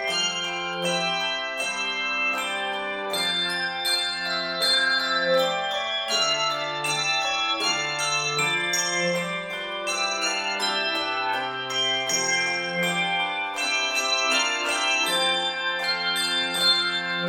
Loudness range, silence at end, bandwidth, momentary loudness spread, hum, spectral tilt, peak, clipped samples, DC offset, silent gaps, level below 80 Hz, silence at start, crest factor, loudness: 2 LU; 0 s; 17 kHz; 6 LU; none; -1 dB/octave; -8 dBFS; under 0.1%; under 0.1%; none; -64 dBFS; 0 s; 18 dB; -23 LUFS